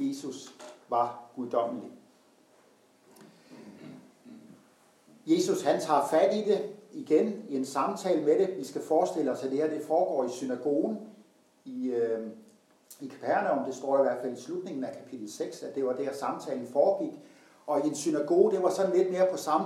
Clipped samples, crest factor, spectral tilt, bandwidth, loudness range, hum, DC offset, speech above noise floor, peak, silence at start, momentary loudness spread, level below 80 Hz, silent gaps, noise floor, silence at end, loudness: under 0.1%; 20 dB; -5 dB/octave; 15 kHz; 8 LU; none; under 0.1%; 34 dB; -10 dBFS; 0 s; 18 LU; under -90 dBFS; none; -62 dBFS; 0 s; -29 LUFS